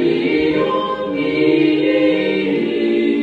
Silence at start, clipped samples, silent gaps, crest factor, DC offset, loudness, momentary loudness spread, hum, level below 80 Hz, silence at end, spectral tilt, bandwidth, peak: 0 s; under 0.1%; none; 12 dB; under 0.1%; -16 LUFS; 5 LU; none; -52 dBFS; 0 s; -7.5 dB/octave; 5.4 kHz; -2 dBFS